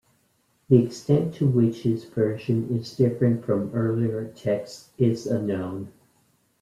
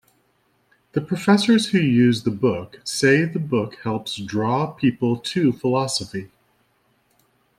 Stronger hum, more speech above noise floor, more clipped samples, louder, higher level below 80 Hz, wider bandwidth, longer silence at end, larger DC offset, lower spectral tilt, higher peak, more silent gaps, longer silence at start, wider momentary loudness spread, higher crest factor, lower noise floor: neither; about the same, 44 dB vs 45 dB; neither; second, -24 LUFS vs -21 LUFS; about the same, -62 dBFS vs -60 dBFS; second, 12.5 kHz vs 14.5 kHz; second, 0.7 s vs 1.3 s; neither; first, -8.5 dB/octave vs -5.5 dB/octave; about the same, -4 dBFS vs -4 dBFS; neither; second, 0.7 s vs 0.95 s; about the same, 9 LU vs 11 LU; about the same, 20 dB vs 18 dB; about the same, -67 dBFS vs -65 dBFS